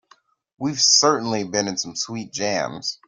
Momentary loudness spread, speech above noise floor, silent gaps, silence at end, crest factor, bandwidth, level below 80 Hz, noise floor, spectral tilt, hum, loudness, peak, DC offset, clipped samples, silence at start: 13 LU; 36 dB; none; 0.15 s; 20 dB; 11.5 kHz; -64 dBFS; -58 dBFS; -2 dB/octave; none; -20 LUFS; -2 dBFS; under 0.1%; under 0.1%; 0.6 s